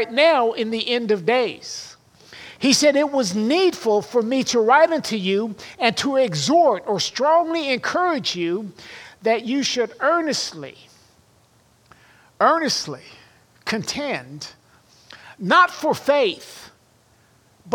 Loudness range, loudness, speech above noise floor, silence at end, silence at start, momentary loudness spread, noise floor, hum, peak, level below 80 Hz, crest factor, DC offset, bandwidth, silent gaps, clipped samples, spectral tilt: 6 LU; -20 LUFS; 37 dB; 0 s; 0 s; 18 LU; -57 dBFS; none; -2 dBFS; -66 dBFS; 18 dB; under 0.1%; 17.5 kHz; none; under 0.1%; -3.5 dB/octave